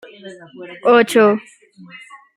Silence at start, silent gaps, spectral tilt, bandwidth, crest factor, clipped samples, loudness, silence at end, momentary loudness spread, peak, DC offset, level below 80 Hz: 0.25 s; none; -4.5 dB/octave; 15 kHz; 18 dB; under 0.1%; -14 LUFS; 0.95 s; 25 LU; 0 dBFS; under 0.1%; -68 dBFS